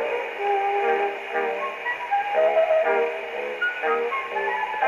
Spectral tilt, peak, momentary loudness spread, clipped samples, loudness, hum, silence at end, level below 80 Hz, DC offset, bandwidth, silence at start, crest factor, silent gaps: -3 dB/octave; -10 dBFS; 7 LU; under 0.1%; -24 LUFS; none; 0 s; -72 dBFS; under 0.1%; 13 kHz; 0 s; 14 dB; none